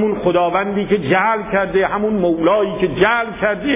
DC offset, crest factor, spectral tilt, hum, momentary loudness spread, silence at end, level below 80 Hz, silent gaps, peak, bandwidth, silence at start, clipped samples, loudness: under 0.1%; 14 dB; -10 dB/octave; none; 4 LU; 0 s; -44 dBFS; none; -2 dBFS; 3.9 kHz; 0 s; under 0.1%; -16 LUFS